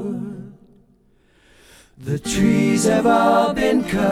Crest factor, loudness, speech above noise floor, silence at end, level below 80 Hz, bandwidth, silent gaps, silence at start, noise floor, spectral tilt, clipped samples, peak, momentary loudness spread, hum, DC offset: 16 dB; -18 LUFS; 40 dB; 0 s; -44 dBFS; 15.5 kHz; none; 0 s; -57 dBFS; -5.5 dB/octave; under 0.1%; -4 dBFS; 16 LU; none; under 0.1%